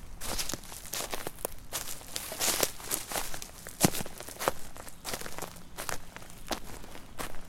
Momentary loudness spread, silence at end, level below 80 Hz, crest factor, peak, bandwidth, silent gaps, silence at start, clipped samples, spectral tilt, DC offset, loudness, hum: 15 LU; 0 s; -48 dBFS; 32 dB; -4 dBFS; 17 kHz; none; 0 s; under 0.1%; -2.5 dB/octave; under 0.1%; -34 LUFS; none